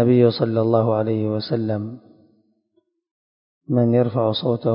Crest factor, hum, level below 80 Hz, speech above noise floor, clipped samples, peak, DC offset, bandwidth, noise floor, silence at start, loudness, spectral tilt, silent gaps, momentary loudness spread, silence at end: 18 dB; none; -60 dBFS; 49 dB; under 0.1%; -4 dBFS; under 0.1%; 5.4 kHz; -68 dBFS; 0 s; -20 LUFS; -12.5 dB/octave; 3.11-3.61 s; 7 LU; 0 s